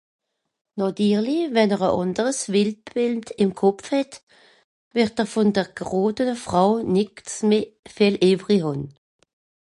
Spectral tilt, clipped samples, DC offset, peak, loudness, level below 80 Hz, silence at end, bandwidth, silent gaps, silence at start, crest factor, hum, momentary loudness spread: -5.5 dB/octave; under 0.1%; under 0.1%; -6 dBFS; -22 LUFS; -58 dBFS; 0.85 s; 11.5 kHz; 4.23-4.27 s, 4.64-4.91 s, 7.79-7.83 s; 0.75 s; 18 dB; none; 8 LU